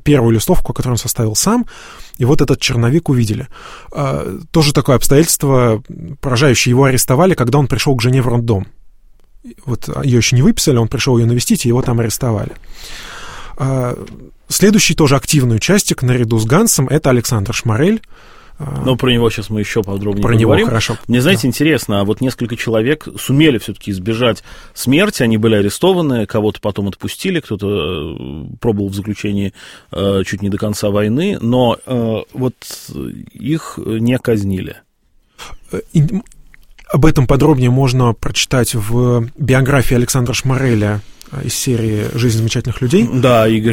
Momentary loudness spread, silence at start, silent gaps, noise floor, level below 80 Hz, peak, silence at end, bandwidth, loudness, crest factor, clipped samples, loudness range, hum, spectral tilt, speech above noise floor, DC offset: 14 LU; 0 s; none; -54 dBFS; -30 dBFS; 0 dBFS; 0 s; 16.5 kHz; -14 LUFS; 14 dB; under 0.1%; 6 LU; none; -5.5 dB/octave; 40 dB; under 0.1%